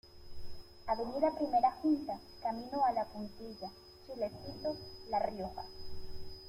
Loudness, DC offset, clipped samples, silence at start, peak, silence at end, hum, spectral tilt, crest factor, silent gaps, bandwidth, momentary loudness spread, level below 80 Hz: -36 LUFS; under 0.1%; under 0.1%; 0.05 s; -18 dBFS; 0 s; none; -6.5 dB/octave; 18 dB; none; 16 kHz; 19 LU; -56 dBFS